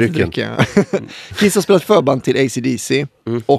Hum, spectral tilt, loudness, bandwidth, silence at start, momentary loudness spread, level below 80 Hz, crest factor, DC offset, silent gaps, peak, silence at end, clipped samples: none; -5.5 dB/octave; -16 LUFS; 14 kHz; 0 s; 10 LU; -48 dBFS; 16 dB; under 0.1%; none; 0 dBFS; 0 s; under 0.1%